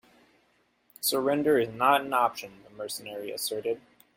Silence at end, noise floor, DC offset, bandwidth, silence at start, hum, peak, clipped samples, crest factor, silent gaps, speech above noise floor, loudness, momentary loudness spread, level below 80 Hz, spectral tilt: 0.35 s; -69 dBFS; under 0.1%; 16.5 kHz; 1 s; none; -8 dBFS; under 0.1%; 20 dB; none; 41 dB; -28 LUFS; 14 LU; -70 dBFS; -3 dB/octave